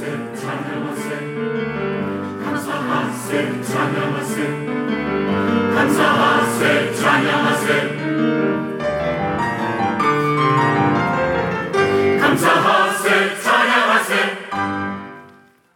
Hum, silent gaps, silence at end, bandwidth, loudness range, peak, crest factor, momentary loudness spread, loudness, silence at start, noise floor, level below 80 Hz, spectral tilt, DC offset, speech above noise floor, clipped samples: none; none; 0.45 s; 19 kHz; 6 LU; -2 dBFS; 16 dB; 10 LU; -18 LUFS; 0 s; -48 dBFS; -52 dBFS; -5 dB/octave; under 0.1%; 30 dB; under 0.1%